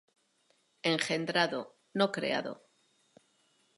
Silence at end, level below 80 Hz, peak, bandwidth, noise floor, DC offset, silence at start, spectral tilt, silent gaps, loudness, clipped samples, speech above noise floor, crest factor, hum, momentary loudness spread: 1.25 s; -86 dBFS; -10 dBFS; 11.5 kHz; -72 dBFS; under 0.1%; 0.85 s; -4 dB/octave; none; -32 LUFS; under 0.1%; 41 dB; 24 dB; none; 11 LU